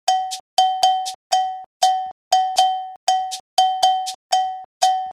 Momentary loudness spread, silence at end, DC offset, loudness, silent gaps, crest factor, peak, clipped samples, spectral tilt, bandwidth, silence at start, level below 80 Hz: 7 LU; 0 s; under 0.1%; -20 LUFS; 0.40-0.57 s, 1.15-1.30 s, 1.66-1.80 s, 2.12-2.31 s, 2.96-3.07 s, 3.40-3.57 s, 4.15-4.30 s, 4.65-4.81 s; 18 dB; -2 dBFS; under 0.1%; 2.5 dB/octave; 14.5 kHz; 0.05 s; -70 dBFS